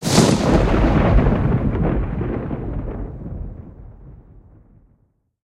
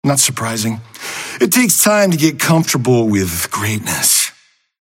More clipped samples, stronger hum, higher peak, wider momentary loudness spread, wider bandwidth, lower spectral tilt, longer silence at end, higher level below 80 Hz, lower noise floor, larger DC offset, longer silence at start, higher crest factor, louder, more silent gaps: neither; neither; about the same, 0 dBFS vs 0 dBFS; first, 17 LU vs 11 LU; about the same, 15 kHz vs 16.5 kHz; first, -6 dB/octave vs -3.5 dB/octave; first, 1.3 s vs 0.55 s; first, -26 dBFS vs -50 dBFS; first, -62 dBFS vs -48 dBFS; neither; about the same, 0 s vs 0.05 s; about the same, 18 dB vs 16 dB; second, -19 LUFS vs -14 LUFS; neither